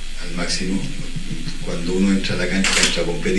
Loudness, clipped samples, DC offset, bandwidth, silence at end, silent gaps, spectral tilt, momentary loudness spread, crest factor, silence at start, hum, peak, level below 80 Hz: -21 LUFS; under 0.1%; under 0.1%; 11.5 kHz; 0 s; none; -3.5 dB/octave; 14 LU; 20 dB; 0 s; none; 0 dBFS; -26 dBFS